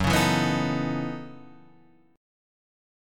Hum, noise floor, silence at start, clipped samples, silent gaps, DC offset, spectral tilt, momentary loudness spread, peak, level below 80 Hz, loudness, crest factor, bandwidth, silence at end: none; -58 dBFS; 0 s; under 0.1%; none; under 0.1%; -5 dB/octave; 17 LU; -10 dBFS; -48 dBFS; -25 LUFS; 18 dB; 17.5 kHz; 0.95 s